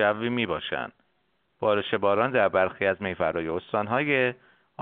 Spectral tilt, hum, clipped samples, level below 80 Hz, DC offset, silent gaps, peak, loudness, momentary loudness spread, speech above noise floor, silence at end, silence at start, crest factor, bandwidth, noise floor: -3 dB/octave; none; under 0.1%; -60 dBFS; under 0.1%; none; -8 dBFS; -26 LUFS; 7 LU; 47 dB; 0 s; 0 s; 20 dB; 4.4 kHz; -72 dBFS